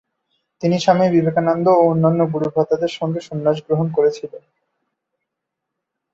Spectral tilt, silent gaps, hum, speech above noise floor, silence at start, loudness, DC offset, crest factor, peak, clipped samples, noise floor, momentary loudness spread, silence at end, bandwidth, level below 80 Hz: -7.5 dB/octave; none; none; 63 dB; 0.6 s; -17 LUFS; under 0.1%; 16 dB; -2 dBFS; under 0.1%; -80 dBFS; 10 LU; 1.75 s; 7.8 kHz; -60 dBFS